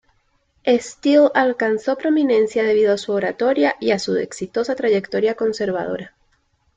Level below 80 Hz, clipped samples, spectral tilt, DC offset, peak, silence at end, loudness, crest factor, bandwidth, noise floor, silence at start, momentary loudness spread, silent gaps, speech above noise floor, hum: -62 dBFS; under 0.1%; -5 dB/octave; under 0.1%; -4 dBFS; 0.7 s; -19 LUFS; 16 dB; 9.2 kHz; -63 dBFS; 0.65 s; 8 LU; none; 45 dB; none